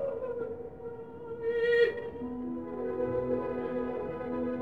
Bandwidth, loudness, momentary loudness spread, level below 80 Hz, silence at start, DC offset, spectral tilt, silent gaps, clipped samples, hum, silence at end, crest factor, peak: 4.8 kHz; -33 LUFS; 15 LU; -58 dBFS; 0 s; 0.1%; -7.5 dB/octave; none; under 0.1%; none; 0 s; 18 dB; -14 dBFS